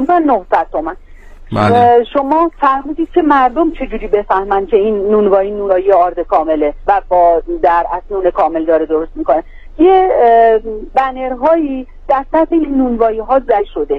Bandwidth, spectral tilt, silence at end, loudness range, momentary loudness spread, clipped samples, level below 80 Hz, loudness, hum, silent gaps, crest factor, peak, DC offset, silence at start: 8.4 kHz; -8 dB/octave; 0 s; 1 LU; 8 LU; under 0.1%; -32 dBFS; -12 LUFS; none; none; 12 dB; 0 dBFS; under 0.1%; 0 s